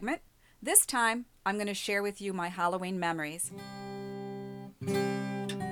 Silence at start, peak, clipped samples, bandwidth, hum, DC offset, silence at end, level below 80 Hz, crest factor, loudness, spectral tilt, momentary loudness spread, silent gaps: 0 s; -8 dBFS; under 0.1%; 19.5 kHz; none; under 0.1%; 0 s; -66 dBFS; 26 dB; -31 LUFS; -3 dB/octave; 17 LU; none